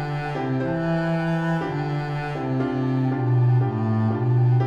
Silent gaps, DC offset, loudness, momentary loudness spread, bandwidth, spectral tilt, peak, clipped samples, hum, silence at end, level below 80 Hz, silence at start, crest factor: none; under 0.1%; -23 LUFS; 7 LU; 6.6 kHz; -9 dB/octave; -12 dBFS; under 0.1%; none; 0 s; -50 dBFS; 0 s; 10 dB